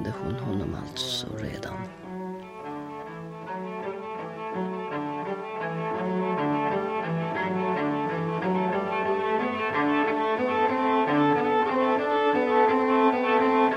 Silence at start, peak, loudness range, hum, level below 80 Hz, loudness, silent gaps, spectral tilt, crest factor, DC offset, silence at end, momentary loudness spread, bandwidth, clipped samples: 0 s; -10 dBFS; 11 LU; none; -58 dBFS; -26 LUFS; none; -6 dB/octave; 16 dB; under 0.1%; 0 s; 14 LU; 13.5 kHz; under 0.1%